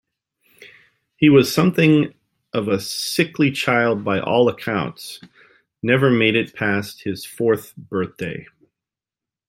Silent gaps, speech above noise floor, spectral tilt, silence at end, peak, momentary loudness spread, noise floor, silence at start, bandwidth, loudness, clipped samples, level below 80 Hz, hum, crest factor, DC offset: none; 70 dB; -5.5 dB/octave; 1.05 s; -2 dBFS; 14 LU; -89 dBFS; 1.2 s; 16.5 kHz; -19 LUFS; under 0.1%; -60 dBFS; none; 18 dB; under 0.1%